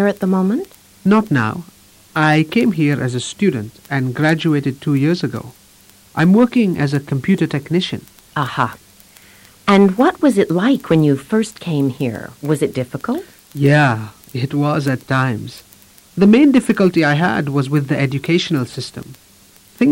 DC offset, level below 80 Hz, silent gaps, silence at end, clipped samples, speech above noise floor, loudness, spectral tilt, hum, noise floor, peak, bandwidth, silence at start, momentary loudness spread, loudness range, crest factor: under 0.1%; -52 dBFS; none; 0 s; under 0.1%; 32 dB; -16 LUFS; -6.5 dB/octave; none; -47 dBFS; -2 dBFS; 16.5 kHz; 0 s; 13 LU; 3 LU; 14 dB